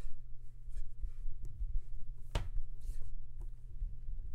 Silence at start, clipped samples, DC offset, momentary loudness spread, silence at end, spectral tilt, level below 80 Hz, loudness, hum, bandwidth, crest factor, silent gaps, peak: 0 s; under 0.1%; under 0.1%; 9 LU; 0 s; -5.5 dB/octave; -40 dBFS; -49 LUFS; none; 5 kHz; 12 dB; none; -22 dBFS